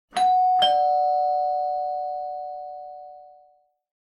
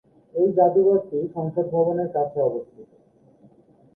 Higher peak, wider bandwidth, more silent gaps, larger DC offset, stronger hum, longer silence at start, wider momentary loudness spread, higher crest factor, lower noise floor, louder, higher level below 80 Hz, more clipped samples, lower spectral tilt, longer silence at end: about the same, -8 dBFS vs -6 dBFS; first, 10.5 kHz vs 1.7 kHz; neither; neither; neither; second, 0.15 s vs 0.35 s; first, 19 LU vs 10 LU; about the same, 16 dB vs 18 dB; first, -60 dBFS vs -55 dBFS; about the same, -22 LUFS vs -22 LUFS; about the same, -68 dBFS vs -66 dBFS; neither; second, -1.5 dB/octave vs -13 dB/octave; second, 0.7 s vs 1.1 s